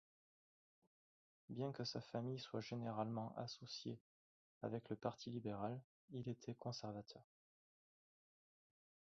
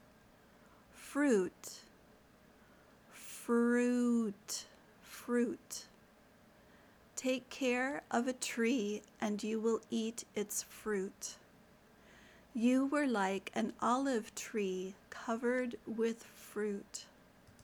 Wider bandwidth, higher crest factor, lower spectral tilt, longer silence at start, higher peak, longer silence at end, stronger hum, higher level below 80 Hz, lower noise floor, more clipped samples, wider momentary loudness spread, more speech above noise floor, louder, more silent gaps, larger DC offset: second, 7.4 kHz vs 20 kHz; about the same, 22 dB vs 18 dB; first, -6 dB/octave vs -4 dB/octave; first, 1.5 s vs 0.95 s; second, -28 dBFS vs -20 dBFS; first, 1.85 s vs 0.6 s; neither; second, -82 dBFS vs -74 dBFS; first, under -90 dBFS vs -64 dBFS; neither; second, 9 LU vs 16 LU; first, over 42 dB vs 28 dB; second, -49 LUFS vs -37 LUFS; first, 4.01-4.61 s, 5.84-6.08 s vs none; neither